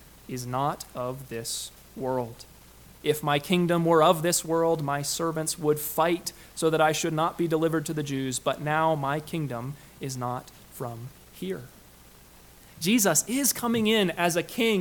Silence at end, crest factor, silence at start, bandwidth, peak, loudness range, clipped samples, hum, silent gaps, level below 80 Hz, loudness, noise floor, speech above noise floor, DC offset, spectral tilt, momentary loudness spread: 0 s; 22 dB; 0 s; 19 kHz; -6 dBFS; 8 LU; under 0.1%; none; none; -58 dBFS; -26 LUFS; -52 dBFS; 26 dB; under 0.1%; -4 dB/octave; 15 LU